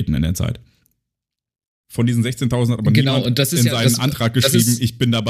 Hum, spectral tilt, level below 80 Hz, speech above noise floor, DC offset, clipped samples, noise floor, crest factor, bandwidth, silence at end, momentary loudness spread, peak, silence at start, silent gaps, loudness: none; -5 dB/octave; -38 dBFS; 67 dB; under 0.1%; under 0.1%; -84 dBFS; 18 dB; 15.5 kHz; 0 s; 7 LU; 0 dBFS; 0 s; 1.67-1.84 s; -17 LUFS